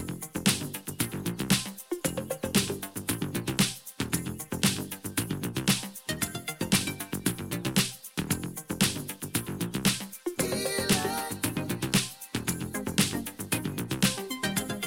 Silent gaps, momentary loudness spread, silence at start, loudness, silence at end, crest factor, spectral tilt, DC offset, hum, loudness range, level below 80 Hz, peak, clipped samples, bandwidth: none; 7 LU; 0 s; -30 LUFS; 0 s; 22 dB; -3.5 dB/octave; under 0.1%; none; 1 LU; -56 dBFS; -8 dBFS; under 0.1%; 17 kHz